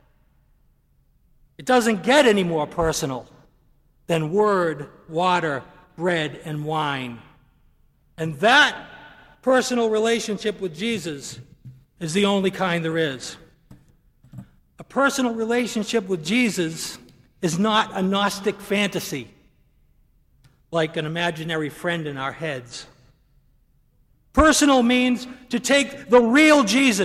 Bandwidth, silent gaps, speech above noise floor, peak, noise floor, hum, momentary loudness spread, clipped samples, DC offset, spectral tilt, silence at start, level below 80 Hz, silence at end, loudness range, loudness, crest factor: 15.5 kHz; none; 40 dB; -2 dBFS; -61 dBFS; none; 16 LU; under 0.1%; under 0.1%; -4 dB/octave; 1.6 s; -48 dBFS; 0 s; 7 LU; -21 LUFS; 20 dB